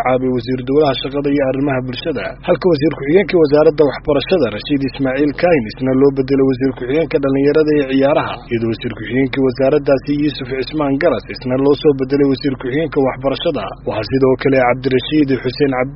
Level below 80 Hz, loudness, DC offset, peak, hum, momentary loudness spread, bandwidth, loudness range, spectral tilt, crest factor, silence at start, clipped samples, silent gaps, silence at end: -38 dBFS; -15 LUFS; under 0.1%; 0 dBFS; none; 7 LU; 5.8 kHz; 2 LU; -5.5 dB/octave; 14 dB; 0 s; under 0.1%; none; 0 s